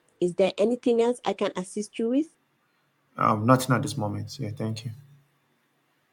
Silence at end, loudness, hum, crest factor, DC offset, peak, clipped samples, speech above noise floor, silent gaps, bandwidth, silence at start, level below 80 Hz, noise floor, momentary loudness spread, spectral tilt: 1.15 s; -26 LUFS; none; 22 dB; under 0.1%; -6 dBFS; under 0.1%; 44 dB; none; 17.5 kHz; 0.2 s; -72 dBFS; -70 dBFS; 13 LU; -6 dB/octave